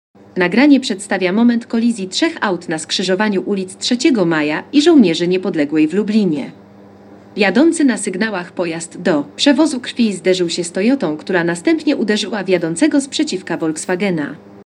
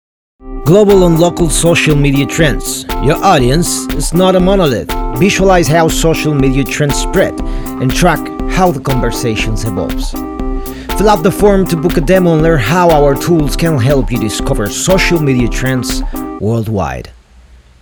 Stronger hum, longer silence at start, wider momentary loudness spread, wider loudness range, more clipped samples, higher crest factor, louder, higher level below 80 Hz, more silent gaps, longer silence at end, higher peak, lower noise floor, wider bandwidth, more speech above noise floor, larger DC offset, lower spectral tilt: neither; about the same, 0.35 s vs 0.45 s; about the same, 8 LU vs 10 LU; about the same, 2 LU vs 4 LU; neither; first, 16 dB vs 10 dB; second, -16 LUFS vs -11 LUFS; second, -68 dBFS vs -20 dBFS; neither; second, 0.05 s vs 0.7 s; about the same, 0 dBFS vs 0 dBFS; about the same, -41 dBFS vs -40 dBFS; second, 11 kHz vs over 20 kHz; second, 25 dB vs 30 dB; neither; about the same, -4.5 dB/octave vs -5 dB/octave